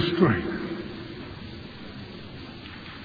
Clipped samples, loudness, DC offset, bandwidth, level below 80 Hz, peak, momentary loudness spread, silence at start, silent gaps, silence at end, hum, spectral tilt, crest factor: under 0.1%; -31 LUFS; under 0.1%; 5 kHz; -50 dBFS; -6 dBFS; 18 LU; 0 s; none; 0 s; none; -8.5 dB/octave; 24 dB